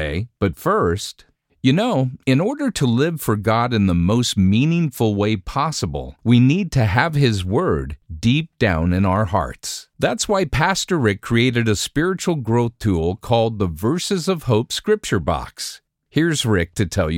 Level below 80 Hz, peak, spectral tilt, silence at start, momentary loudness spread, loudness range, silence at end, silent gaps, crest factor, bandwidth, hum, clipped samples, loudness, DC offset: -38 dBFS; 0 dBFS; -5.5 dB/octave; 0 s; 7 LU; 3 LU; 0 s; none; 18 dB; 17 kHz; none; under 0.1%; -19 LUFS; under 0.1%